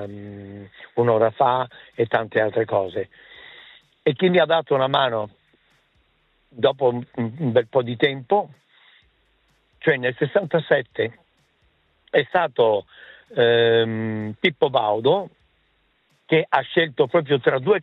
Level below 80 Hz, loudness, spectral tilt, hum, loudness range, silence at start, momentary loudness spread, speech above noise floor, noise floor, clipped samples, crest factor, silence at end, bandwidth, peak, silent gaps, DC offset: -68 dBFS; -21 LUFS; -8.5 dB/octave; none; 3 LU; 0 s; 13 LU; 44 dB; -65 dBFS; under 0.1%; 18 dB; 0 s; 4.5 kHz; -4 dBFS; none; under 0.1%